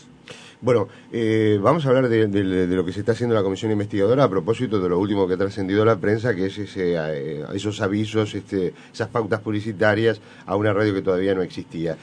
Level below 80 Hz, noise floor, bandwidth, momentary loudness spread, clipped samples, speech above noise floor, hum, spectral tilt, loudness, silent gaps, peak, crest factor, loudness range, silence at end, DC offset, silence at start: -56 dBFS; -43 dBFS; 10 kHz; 10 LU; under 0.1%; 22 dB; none; -7 dB/octave; -22 LUFS; none; -2 dBFS; 20 dB; 4 LU; 0.05 s; under 0.1%; 0.3 s